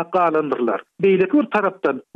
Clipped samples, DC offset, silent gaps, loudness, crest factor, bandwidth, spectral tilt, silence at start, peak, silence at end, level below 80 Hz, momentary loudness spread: under 0.1%; under 0.1%; none; -19 LUFS; 12 dB; 5.2 kHz; -8.5 dB/octave; 0 s; -6 dBFS; 0.15 s; -66 dBFS; 6 LU